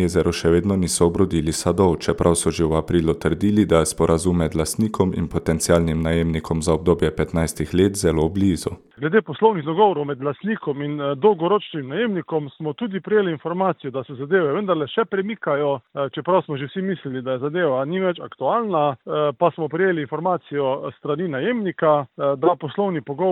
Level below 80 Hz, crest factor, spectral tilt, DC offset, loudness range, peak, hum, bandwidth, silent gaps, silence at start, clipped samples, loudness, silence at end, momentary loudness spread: -40 dBFS; 18 dB; -5.5 dB/octave; under 0.1%; 4 LU; -2 dBFS; none; 15 kHz; none; 0 s; under 0.1%; -21 LUFS; 0 s; 7 LU